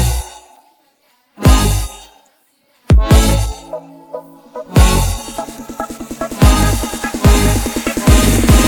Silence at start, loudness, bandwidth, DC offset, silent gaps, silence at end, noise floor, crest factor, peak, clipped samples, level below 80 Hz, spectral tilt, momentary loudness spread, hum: 0 s; -14 LUFS; over 20 kHz; under 0.1%; none; 0 s; -57 dBFS; 14 dB; 0 dBFS; under 0.1%; -16 dBFS; -5 dB/octave; 20 LU; none